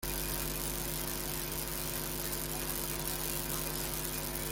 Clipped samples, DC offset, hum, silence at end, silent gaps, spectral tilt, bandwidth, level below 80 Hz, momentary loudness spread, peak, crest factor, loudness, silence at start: under 0.1%; under 0.1%; none; 0 s; none; -2.5 dB/octave; 17 kHz; -46 dBFS; 1 LU; -12 dBFS; 24 dB; -35 LUFS; 0 s